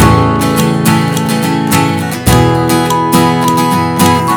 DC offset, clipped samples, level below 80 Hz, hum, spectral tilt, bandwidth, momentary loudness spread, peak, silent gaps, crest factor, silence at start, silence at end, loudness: under 0.1%; 1%; -28 dBFS; none; -5.5 dB/octave; over 20 kHz; 3 LU; 0 dBFS; none; 10 dB; 0 s; 0 s; -10 LUFS